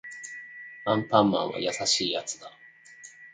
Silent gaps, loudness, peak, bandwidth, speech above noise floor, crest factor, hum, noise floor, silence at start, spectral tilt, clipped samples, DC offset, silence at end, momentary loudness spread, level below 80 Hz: none; -26 LUFS; -6 dBFS; 9.6 kHz; 24 dB; 24 dB; none; -50 dBFS; 0.05 s; -3.5 dB/octave; under 0.1%; under 0.1%; 0.05 s; 24 LU; -68 dBFS